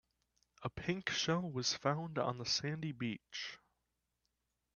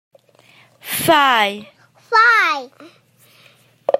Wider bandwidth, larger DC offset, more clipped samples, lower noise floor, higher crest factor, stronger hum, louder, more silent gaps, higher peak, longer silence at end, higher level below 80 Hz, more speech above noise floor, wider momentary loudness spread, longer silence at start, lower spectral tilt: second, 7.4 kHz vs 16 kHz; neither; neither; first, -86 dBFS vs -51 dBFS; first, 24 dB vs 18 dB; first, 60 Hz at -60 dBFS vs none; second, -38 LUFS vs -15 LUFS; neither; second, -18 dBFS vs -2 dBFS; first, 1.2 s vs 0 s; about the same, -70 dBFS vs -68 dBFS; first, 47 dB vs 36 dB; second, 11 LU vs 16 LU; second, 0.6 s vs 0.85 s; first, -4 dB/octave vs -2.5 dB/octave